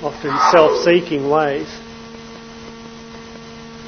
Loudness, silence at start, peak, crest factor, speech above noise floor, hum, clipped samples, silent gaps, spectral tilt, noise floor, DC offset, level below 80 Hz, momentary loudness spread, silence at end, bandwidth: -15 LUFS; 0 s; 0 dBFS; 18 dB; 20 dB; none; under 0.1%; none; -5 dB/octave; -35 dBFS; under 0.1%; -50 dBFS; 23 LU; 0 s; 6.6 kHz